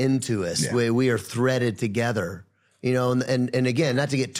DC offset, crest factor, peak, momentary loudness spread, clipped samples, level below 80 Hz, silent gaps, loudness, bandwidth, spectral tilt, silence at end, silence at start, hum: under 0.1%; 14 dB; -10 dBFS; 5 LU; under 0.1%; -60 dBFS; none; -24 LUFS; 15.5 kHz; -5.5 dB/octave; 0 s; 0 s; none